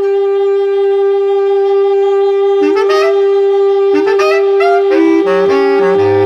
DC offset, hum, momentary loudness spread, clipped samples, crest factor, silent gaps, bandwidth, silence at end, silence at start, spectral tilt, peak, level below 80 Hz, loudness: under 0.1%; none; 2 LU; under 0.1%; 8 dB; none; 6.8 kHz; 0 s; 0 s; -6 dB/octave; 0 dBFS; -56 dBFS; -10 LUFS